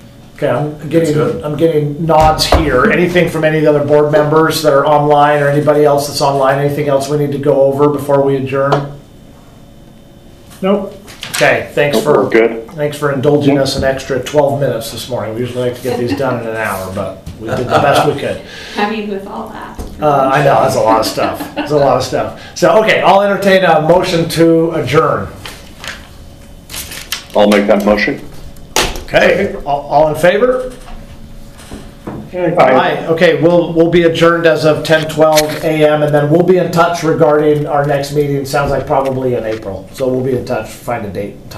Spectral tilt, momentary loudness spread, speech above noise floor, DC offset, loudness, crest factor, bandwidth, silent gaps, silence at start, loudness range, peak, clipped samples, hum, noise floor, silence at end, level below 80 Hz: -5.5 dB/octave; 13 LU; 26 dB; under 0.1%; -12 LUFS; 12 dB; 15.5 kHz; none; 0.05 s; 6 LU; 0 dBFS; 0.2%; none; -37 dBFS; 0 s; -34 dBFS